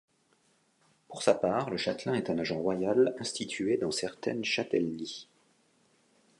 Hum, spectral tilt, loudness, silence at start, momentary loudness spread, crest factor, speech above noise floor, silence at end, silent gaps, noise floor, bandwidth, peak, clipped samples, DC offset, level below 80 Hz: none; -4.5 dB/octave; -31 LUFS; 1.1 s; 8 LU; 22 dB; 39 dB; 1.15 s; none; -70 dBFS; 11.5 kHz; -10 dBFS; under 0.1%; under 0.1%; -68 dBFS